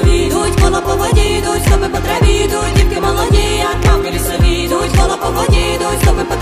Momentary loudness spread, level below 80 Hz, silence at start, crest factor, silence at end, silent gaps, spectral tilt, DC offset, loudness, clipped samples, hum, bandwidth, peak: 2 LU; -16 dBFS; 0 s; 12 dB; 0 s; none; -5 dB/octave; under 0.1%; -13 LUFS; under 0.1%; none; 15.5 kHz; 0 dBFS